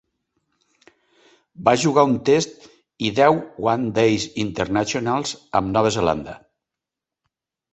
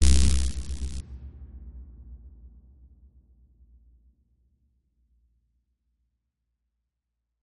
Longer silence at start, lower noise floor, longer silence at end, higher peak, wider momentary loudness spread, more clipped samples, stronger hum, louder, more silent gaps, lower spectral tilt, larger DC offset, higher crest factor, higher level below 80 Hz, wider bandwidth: first, 1.6 s vs 0 s; about the same, -86 dBFS vs -83 dBFS; first, 1.35 s vs 0 s; about the same, -2 dBFS vs -4 dBFS; second, 8 LU vs 26 LU; neither; neither; first, -20 LUFS vs -28 LUFS; neither; about the same, -5 dB/octave vs -4 dB/octave; neither; second, 20 dB vs 26 dB; second, -50 dBFS vs -32 dBFS; second, 8.4 kHz vs 11.5 kHz